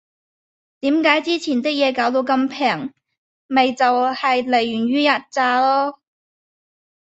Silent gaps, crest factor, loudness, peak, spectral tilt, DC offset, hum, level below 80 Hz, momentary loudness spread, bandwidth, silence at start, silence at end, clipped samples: 3.18-3.49 s; 18 dB; -18 LUFS; -2 dBFS; -4 dB/octave; under 0.1%; none; -66 dBFS; 5 LU; 8.2 kHz; 0.85 s; 1.1 s; under 0.1%